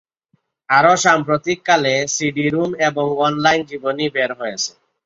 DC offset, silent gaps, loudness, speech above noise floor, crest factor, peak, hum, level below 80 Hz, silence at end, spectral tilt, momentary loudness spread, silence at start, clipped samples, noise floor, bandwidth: under 0.1%; none; -17 LUFS; 48 dB; 16 dB; -2 dBFS; none; -58 dBFS; 0.35 s; -3.5 dB/octave; 9 LU; 0.7 s; under 0.1%; -65 dBFS; 7.8 kHz